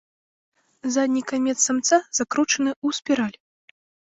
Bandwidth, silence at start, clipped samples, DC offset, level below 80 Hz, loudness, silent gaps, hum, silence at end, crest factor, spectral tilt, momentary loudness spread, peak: 8.2 kHz; 0.85 s; under 0.1%; under 0.1%; -68 dBFS; -22 LUFS; 2.76-2.82 s; none; 0.85 s; 20 dB; -2 dB/octave; 6 LU; -4 dBFS